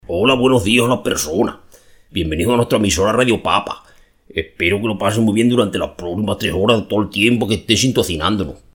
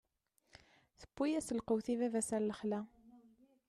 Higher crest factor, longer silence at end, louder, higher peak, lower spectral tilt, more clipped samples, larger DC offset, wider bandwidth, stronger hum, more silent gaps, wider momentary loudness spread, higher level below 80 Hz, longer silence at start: about the same, 16 dB vs 16 dB; second, 0.2 s vs 0.5 s; first, -16 LUFS vs -38 LUFS; first, 0 dBFS vs -24 dBFS; about the same, -4.5 dB/octave vs -5 dB/octave; neither; neither; first, 18.5 kHz vs 13 kHz; neither; neither; about the same, 9 LU vs 7 LU; first, -40 dBFS vs -72 dBFS; second, 0.1 s vs 1 s